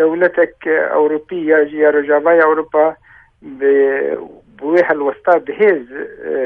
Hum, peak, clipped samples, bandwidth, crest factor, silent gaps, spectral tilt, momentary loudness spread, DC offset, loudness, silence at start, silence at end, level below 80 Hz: none; 0 dBFS; under 0.1%; 4.8 kHz; 14 dB; none; -8 dB/octave; 9 LU; under 0.1%; -14 LUFS; 0 s; 0 s; -58 dBFS